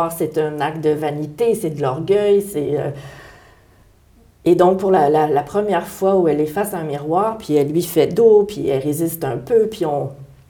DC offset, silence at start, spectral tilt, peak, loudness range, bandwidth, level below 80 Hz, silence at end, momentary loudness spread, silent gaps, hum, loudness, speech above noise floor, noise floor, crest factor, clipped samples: under 0.1%; 0 s; -6.5 dB/octave; -2 dBFS; 3 LU; over 20 kHz; -52 dBFS; 0.25 s; 9 LU; none; none; -18 LUFS; 34 dB; -51 dBFS; 16 dB; under 0.1%